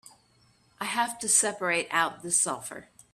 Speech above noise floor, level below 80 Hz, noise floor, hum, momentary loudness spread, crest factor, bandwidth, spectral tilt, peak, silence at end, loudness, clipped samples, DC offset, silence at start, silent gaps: 36 dB; -72 dBFS; -64 dBFS; none; 14 LU; 22 dB; 15.5 kHz; -1 dB/octave; -8 dBFS; 0.3 s; -26 LUFS; under 0.1%; under 0.1%; 0.8 s; none